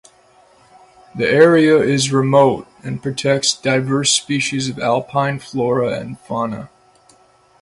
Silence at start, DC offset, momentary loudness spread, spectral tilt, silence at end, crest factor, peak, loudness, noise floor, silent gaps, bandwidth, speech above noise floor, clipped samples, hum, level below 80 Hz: 1.15 s; under 0.1%; 14 LU; -4.5 dB/octave; 0.95 s; 18 dB; 0 dBFS; -16 LUFS; -52 dBFS; none; 11.5 kHz; 36 dB; under 0.1%; none; -56 dBFS